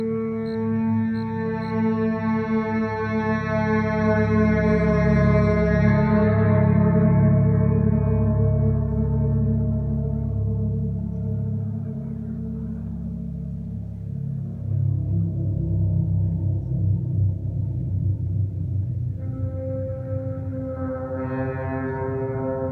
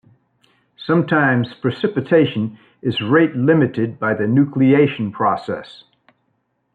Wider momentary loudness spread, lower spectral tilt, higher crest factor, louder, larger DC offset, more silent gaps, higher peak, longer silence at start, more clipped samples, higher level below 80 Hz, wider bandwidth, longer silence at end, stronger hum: about the same, 11 LU vs 11 LU; first, -10.5 dB/octave vs -9 dB/octave; about the same, 16 dB vs 16 dB; second, -23 LUFS vs -17 LUFS; neither; neither; second, -6 dBFS vs -2 dBFS; second, 0 s vs 0.8 s; neither; first, -34 dBFS vs -62 dBFS; first, 6 kHz vs 4.8 kHz; second, 0 s vs 1 s; neither